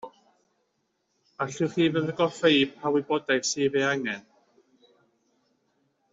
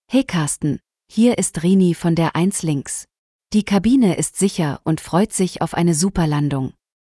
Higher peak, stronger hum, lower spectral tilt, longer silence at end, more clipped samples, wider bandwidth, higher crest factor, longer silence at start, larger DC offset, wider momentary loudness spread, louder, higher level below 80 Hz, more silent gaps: second, -8 dBFS vs -4 dBFS; neither; second, -4 dB/octave vs -5.5 dB/octave; first, 1.9 s vs 0.4 s; neither; second, 8 kHz vs 12 kHz; first, 20 dB vs 14 dB; about the same, 0.05 s vs 0.1 s; neither; first, 12 LU vs 8 LU; second, -25 LUFS vs -19 LUFS; second, -72 dBFS vs -44 dBFS; second, none vs 3.19-3.39 s